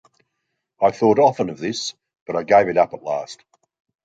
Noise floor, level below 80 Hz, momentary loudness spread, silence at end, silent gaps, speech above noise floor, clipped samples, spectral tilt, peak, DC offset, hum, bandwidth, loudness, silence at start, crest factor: -77 dBFS; -62 dBFS; 12 LU; 0.7 s; 2.21-2.26 s; 58 dB; under 0.1%; -5 dB/octave; -2 dBFS; under 0.1%; none; 9 kHz; -19 LUFS; 0.8 s; 18 dB